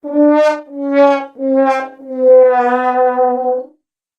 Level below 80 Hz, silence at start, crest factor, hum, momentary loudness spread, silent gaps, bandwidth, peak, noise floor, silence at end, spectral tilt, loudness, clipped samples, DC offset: -70 dBFS; 0.05 s; 12 dB; none; 11 LU; none; 7.8 kHz; 0 dBFS; -54 dBFS; 0.55 s; -4.5 dB/octave; -13 LUFS; under 0.1%; under 0.1%